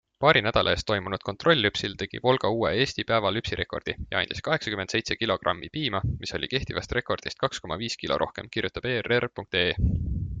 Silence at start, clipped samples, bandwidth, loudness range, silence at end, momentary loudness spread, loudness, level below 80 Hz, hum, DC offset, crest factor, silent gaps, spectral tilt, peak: 0.2 s; under 0.1%; 9.4 kHz; 4 LU; 0 s; 9 LU; -26 LUFS; -42 dBFS; none; under 0.1%; 22 dB; none; -5 dB/octave; -4 dBFS